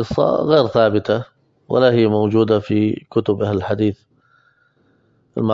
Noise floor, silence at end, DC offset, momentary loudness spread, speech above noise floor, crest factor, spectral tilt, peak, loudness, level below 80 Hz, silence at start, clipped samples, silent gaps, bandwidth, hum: -59 dBFS; 0 s; under 0.1%; 9 LU; 43 dB; 16 dB; -8.5 dB/octave; 0 dBFS; -17 LUFS; -50 dBFS; 0 s; under 0.1%; none; 7.4 kHz; none